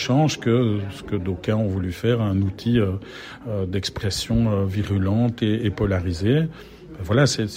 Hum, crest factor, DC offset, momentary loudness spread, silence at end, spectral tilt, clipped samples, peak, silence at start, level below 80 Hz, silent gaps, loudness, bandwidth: none; 18 dB; under 0.1%; 9 LU; 0 s; -6 dB/octave; under 0.1%; -4 dBFS; 0 s; -42 dBFS; none; -22 LUFS; 16 kHz